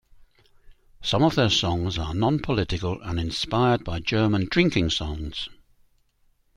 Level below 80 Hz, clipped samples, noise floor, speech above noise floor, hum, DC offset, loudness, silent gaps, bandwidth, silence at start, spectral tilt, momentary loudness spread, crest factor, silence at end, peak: -42 dBFS; under 0.1%; -64 dBFS; 41 dB; none; under 0.1%; -24 LUFS; none; 12 kHz; 0.65 s; -5.5 dB/octave; 10 LU; 20 dB; 1.05 s; -4 dBFS